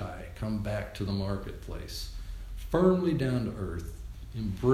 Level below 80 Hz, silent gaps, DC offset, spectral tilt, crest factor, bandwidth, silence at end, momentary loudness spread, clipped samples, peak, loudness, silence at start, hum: -42 dBFS; none; under 0.1%; -7.5 dB/octave; 18 dB; 15.5 kHz; 0 s; 17 LU; under 0.1%; -12 dBFS; -32 LUFS; 0 s; none